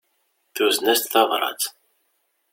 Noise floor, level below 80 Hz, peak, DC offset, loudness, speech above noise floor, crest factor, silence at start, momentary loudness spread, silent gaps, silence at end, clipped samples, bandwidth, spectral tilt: -70 dBFS; -74 dBFS; -2 dBFS; under 0.1%; -20 LUFS; 50 dB; 20 dB; 0.55 s; 10 LU; none; 0.8 s; under 0.1%; 17 kHz; -0.5 dB/octave